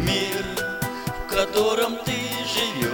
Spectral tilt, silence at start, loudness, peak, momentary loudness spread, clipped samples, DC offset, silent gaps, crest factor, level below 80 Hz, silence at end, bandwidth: -3.5 dB/octave; 0 s; -24 LUFS; -8 dBFS; 7 LU; under 0.1%; under 0.1%; none; 16 dB; -42 dBFS; 0 s; 19.5 kHz